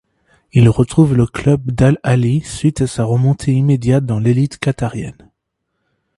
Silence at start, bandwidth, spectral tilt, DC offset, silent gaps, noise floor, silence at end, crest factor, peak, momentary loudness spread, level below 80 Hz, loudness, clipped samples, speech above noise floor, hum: 0.55 s; 11.5 kHz; -7.5 dB/octave; under 0.1%; none; -73 dBFS; 1.05 s; 14 dB; 0 dBFS; 7 LU; -38 dBFS; -15 LUFS; under 0.1%; 59 dB; none